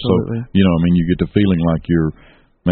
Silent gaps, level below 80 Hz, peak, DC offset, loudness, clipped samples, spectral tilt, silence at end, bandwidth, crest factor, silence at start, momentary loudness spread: none; -34 dBFS; 0 dBFS; under 0.1%; -16 LUFS; under 0.1%; -7.5 dB/octave; 0 s; 4.4 kHz; 16 dB; 0 s; 5 LU